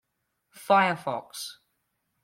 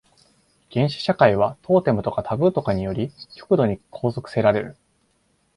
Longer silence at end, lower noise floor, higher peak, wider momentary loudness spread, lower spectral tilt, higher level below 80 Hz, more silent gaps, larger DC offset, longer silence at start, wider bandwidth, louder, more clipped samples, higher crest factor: second, 0.7 s vs 0.85 s; first, -79 dBFS vs -66 dBFS; second, -8 dBFS vs 0 dBFS; first, 17 LU vs 11 LU; second, -4 dB/octave vs -8 dB/octave; second, -78 dBFS vs -50 dBFS; neither; neither; second, 0.55 s vs 0.7 s; first, 16.5 kHz vs 11.5 kHz; second, -25 LUFS vs -21 LUFS; neither; about the same, 20 dB vs 22 dB